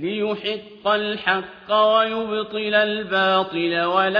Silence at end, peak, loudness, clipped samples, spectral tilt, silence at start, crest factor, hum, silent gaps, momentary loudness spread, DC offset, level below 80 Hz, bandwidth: 0 s; -4 dBFS; -21 LUFS; under 0.1%; -6.5 dB/octave; 0 s; 16 dB; none; none; 8 LU; under 0.1%; -62 dBFS; 5.2 kHz